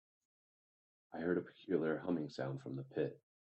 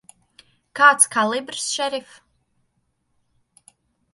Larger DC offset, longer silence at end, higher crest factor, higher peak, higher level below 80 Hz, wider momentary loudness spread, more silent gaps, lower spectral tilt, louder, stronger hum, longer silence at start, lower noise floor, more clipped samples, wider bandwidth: neither; second, 0.3 s vs 2.15 s; about the same, 20 dB vs 22 dB; second, -22 dBFS vs 0 dBFS; second, -82 dBFS vs -74 dBFS; second, 7 LU vs 16 LU; neither; first, -8 dB/octave vs -0.5 dB/octave; second, -41 LUFS vs -18 LUFS; neither; first, 1.1 s vs 0.75 s; first, under -90 dBFS vs -70 dBFS; neither; second, 8.2 kHz vs 12 kHz